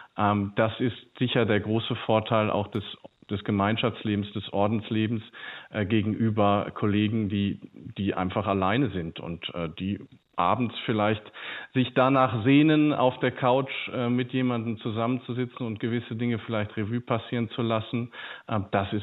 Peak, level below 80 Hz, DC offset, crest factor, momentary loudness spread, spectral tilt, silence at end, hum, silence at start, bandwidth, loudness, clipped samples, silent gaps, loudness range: -10 dBFS; -62 dBFS; under 0.1%; 18 dB; 11 LU; -9.5 dB/octave; 0 s; none; 0 s; 4.1 kHz; -27 LUFS; under 0.1%; none; 6 LU